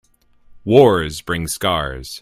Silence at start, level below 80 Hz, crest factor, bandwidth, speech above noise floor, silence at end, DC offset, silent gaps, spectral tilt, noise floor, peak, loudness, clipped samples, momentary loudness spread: 0.5 s; -40 dBFS; 18 dB; 16 kHz; 32 dB; 0.05 s; under 0.1%; none; -5 dB/octave; -49 dBFS; 0 dBFS; -17 LUFS; under 0.1%; 13 LU